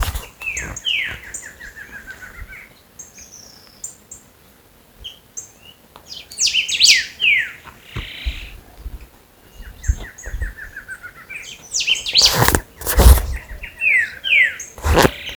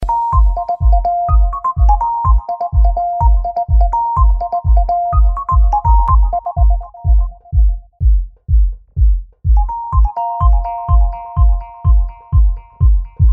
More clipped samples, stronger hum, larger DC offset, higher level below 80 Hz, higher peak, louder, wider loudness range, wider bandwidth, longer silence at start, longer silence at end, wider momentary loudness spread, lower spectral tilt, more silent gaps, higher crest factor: neither; neither; neither; second, -26 dBFS vs -12 dBFS; about the same, 0 dBFS vs 0 dBFS; about the same, -16 LUFS vs -15 LUFS; first, 22 LU vs 2 LU; first, over 20 kHz vs 1.5 kHz; about the same, 0 s vs 0 s; about the same, 0 s vs 0 s; first, 25 LU vs 4 LU; second, -2.5 dB/octave vs -11 dB/octave; neither; first, 20 dB vs 12 dB